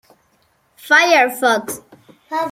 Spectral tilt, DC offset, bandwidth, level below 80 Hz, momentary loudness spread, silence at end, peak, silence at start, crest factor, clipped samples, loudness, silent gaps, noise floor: -1.5 dB/octave; under 0.1%; 16.5 kHz; -68 dBFS; 18 LU; 0 s; -2 dBFS; 0.85 s; 18 dB; under 0.1%; -14 LUFS; none; -60 dBFS